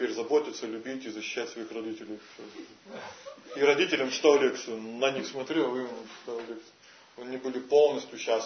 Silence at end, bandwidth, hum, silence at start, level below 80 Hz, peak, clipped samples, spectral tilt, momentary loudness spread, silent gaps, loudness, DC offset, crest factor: 0 s; 6.6 kHz; none; 0 s; -82 dBFS; -10 dBFS; under 0.1%; -3 dB/octave; 21 LU; none; -29 LUFS; under 0.1%; 20 dB